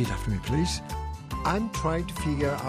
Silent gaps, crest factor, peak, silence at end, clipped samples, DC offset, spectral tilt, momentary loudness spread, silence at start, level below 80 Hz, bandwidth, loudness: none; 18 dB; -10 dBFS; 0 s; under 0.1%; under 0.1%; -5.5 dB/octave; 8 LU; 0 s; -36 dBFS; 15.5 kHz; -29 LUFS